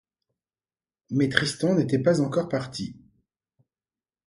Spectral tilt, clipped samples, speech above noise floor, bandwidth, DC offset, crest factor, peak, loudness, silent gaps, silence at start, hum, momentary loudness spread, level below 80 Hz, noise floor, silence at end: -5.5 dB/octave; under 0.1%; over 66 dB; 11.5 kHz; under 0.1%; 28 dB; 0 dBFS; -24 LUFS; none; 1.1 s; none; 12 LU; -62 dBFS; under -90 dBFS; 1.3 s